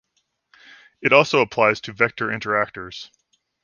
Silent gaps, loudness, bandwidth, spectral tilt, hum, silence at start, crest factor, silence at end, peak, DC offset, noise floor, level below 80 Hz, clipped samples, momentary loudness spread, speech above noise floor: none; -19 LUFS; 7.2 kHz; -4.5 dB/octave; none; 1 s; 22 dB; 0.6 s; 0 dBFS; under 0.1%; -71 dBFS; -62 dBFS; under 0.1%; 17 LU; 51 dB